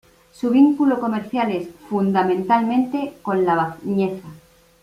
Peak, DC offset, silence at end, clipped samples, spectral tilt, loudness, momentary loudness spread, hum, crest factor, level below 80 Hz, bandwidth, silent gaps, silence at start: -4 dBFS; under 0.1%; 0.45 s; under 0.1%; -8 dB/octave; -20 LUFS; 10 LU; none; 16 dB; -60 dBFS; 13 kHz; none; 0.4 s